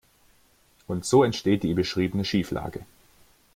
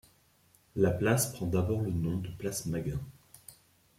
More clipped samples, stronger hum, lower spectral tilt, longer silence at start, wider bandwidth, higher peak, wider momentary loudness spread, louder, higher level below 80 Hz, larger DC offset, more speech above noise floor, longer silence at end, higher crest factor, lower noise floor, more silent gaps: neither; neither; about the same, -5.5 dB/octave vs -5.5 dB/octave; first, 0.9 s vs 0.75 s; about the same, 16 kHz vs 16.5 kHz; first, -8 dBFS vs -12 dBFS; second, 13 LU vs 21 LU; first, -25 LUFS vs -32 LUFS; about the same, -54 dBFS vs -54 dBFS; neither; about the same, 37 dB vs 35 dB; first, 0.7 s vs 0.45 s; about the same, 20 dB vs 20 dB; second, -61 dBFS vs -66 dBFS; neither